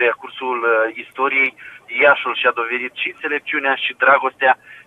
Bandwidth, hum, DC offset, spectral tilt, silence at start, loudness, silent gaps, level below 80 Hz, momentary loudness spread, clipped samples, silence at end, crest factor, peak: 4.5 kHz; none; under 0.1%; -4 dB/octave; 0 s; -17 LUFS; none; -72 dBFS; 9 LU; under 0.1%; 0.05 s; 18 dB; 0 dBFS